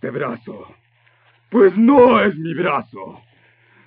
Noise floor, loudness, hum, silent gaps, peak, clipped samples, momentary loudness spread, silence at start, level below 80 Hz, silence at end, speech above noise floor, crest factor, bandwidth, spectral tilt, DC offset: -56 dBFS; -15 LUFS; none; none; -2 dBFS; under 0.1%; 25 LU; 0.05 s; -58 dBFS; 0.75 s; 41 dB; 16 dB; 4.6 kHz; -10.5 dB/octave; under 0.1%